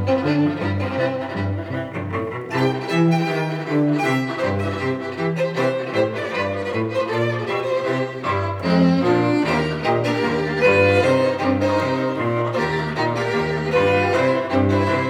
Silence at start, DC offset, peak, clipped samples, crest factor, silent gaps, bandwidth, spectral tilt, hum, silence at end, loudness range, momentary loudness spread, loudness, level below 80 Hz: 0 s; under 0.1%; -4 dBFS; under 0.1%; 16 dB; none; 14 kHz; -7 dB/octave; none; 0 s; 4 LU; 7 LU; -20 LUFS; -54 dBFS